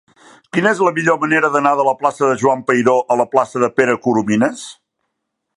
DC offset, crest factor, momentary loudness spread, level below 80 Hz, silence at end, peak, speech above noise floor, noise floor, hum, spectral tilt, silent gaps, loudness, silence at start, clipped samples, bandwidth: under 0.1%; 16 dB; 3 LU; -62 dBFS; 0.85 s; 0 dBFS; 60 dB; -75 dBFS; none; -5.5 dB/octave; none; -15 LUFS; 0.55 s; under 0.1%; 11.5 kHz